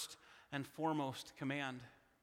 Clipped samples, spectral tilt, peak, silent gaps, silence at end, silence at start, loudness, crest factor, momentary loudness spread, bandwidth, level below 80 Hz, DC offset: under 0.1%; -4.5 dB/octave; -26 dBFS; none; 0.3 s; 0 s; -43 LUFS; 18 dB; 16 LU; 16.5 kHz; -80 dBFS; under 0.1%